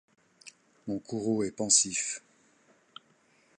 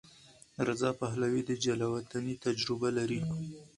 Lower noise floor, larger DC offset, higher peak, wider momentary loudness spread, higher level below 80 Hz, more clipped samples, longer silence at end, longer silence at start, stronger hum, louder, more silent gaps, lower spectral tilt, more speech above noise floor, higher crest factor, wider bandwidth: first, -66 dBFS vs -59 dBFS; neither; first, -8 dBFS vs -16 dBFS; first, 16 LU vs 6 LU; second, -70 dBFS vs -64 dBFS; neither; first, 1.4 s vs 0.1 s; first, 0.45 s vs 0.25 s; neither; first, -28 LUFS vs -33 LUFS; neither; second, -2 dB/octave vs -5.5 dB/octave; first, 37 dB vs 26 dB; first, 26 dB vs 18 dB; about the same, 11.5 kHz vs 11.5 kHz